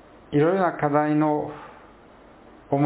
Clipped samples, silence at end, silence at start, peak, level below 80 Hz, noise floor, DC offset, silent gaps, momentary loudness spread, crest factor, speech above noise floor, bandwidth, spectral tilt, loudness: under 0.1%; 0 s; 0.3 s; -6 dBFS; -60 dBFS; -50 dBFS; under 0.1%; none; 10 LU; 18 dB; 28 dB; 4 kHz; -12 dB/octave; -23 LUFS